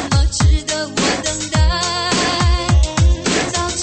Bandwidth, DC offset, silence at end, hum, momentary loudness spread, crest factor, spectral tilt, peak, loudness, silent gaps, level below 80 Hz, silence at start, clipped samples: 8.8 kHz; under 0.1%; 0 s; none; 4 LU; 12 dB; -4 dB/octave; -4 dBFS; -16 LUFS; none; -18 dBFS; 0 s; under 0.1%